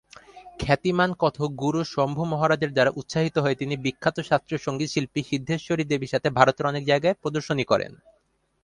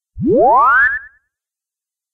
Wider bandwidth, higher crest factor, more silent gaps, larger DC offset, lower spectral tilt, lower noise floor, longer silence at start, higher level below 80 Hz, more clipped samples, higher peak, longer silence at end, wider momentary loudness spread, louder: first, 11 kHz vs 6 kHz; first, 24 dB vs 14 dB; neither; neither; second, -6 dB/octave vs -9 dB/octave; second, -47 dBFS vs -87 dBFS; first, 0.35 s vs 0.15 s; second, -54 dBFS vs -44 dBFS; neither; about the same, 0 dBFS vs -2 dBFS; second, 0.7 s vs 1.05 s; about the same, 7 LU vs 7 LU; second, -24 LUFS vs -11 LUFS